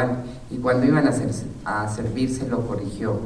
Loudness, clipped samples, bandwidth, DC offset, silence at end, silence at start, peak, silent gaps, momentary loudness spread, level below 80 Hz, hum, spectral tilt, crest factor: -24 LUFS; under 0.1%; 11 kHz; under 0.1%; 0 s; 0 s; -8 dBFS; none; 10 LU; -44 dBFS; none; -7 dB/octave; 16 dB